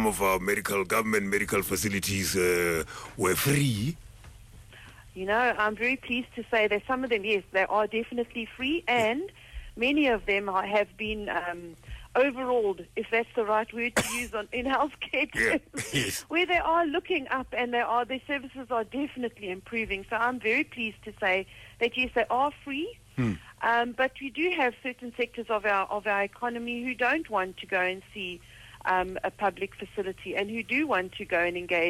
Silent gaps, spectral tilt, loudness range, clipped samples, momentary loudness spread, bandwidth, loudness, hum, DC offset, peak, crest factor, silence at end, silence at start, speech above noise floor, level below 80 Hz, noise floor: none; -4 dB/octave; 3 LU; under 0.1%; 9 LU; 16 kHz; -28 LUFS; none; under 0.1%; -14 dBFS; 16 dB; 0 s; 0 s; 21 dB; -52 dBFS; -50 dBFS